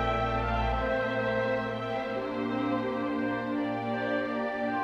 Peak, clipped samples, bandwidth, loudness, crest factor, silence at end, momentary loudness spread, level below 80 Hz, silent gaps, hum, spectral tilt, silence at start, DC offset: -16 dBFS; under 0.1%; 8.4 kHz; -30 LUFS; 14 dB; 0 s; 3 LU; -42 dBFS; none; none; -7.5 dB/octave; 0 s; under 0.1%